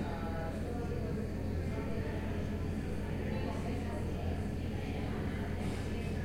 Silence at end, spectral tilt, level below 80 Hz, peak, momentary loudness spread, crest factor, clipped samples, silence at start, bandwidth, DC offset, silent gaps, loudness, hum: 0 s; -7.5 dB/octave; -46 dBFS; -24 dBFS; 1 LU; 12 dB; under 0.1%; 0 s; 16 kHz; 0.3%; none; -38 LUFS; none